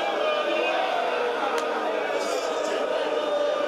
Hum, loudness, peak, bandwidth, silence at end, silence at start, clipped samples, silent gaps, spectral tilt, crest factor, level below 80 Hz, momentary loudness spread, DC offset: none; -25 LUFS; -12 dBFS; 13 kHz; 0 s; 0 s; under 0.1%; none; -2 dB/octave; 12 dB; -72 dBFS; 3 LU; under 0.1%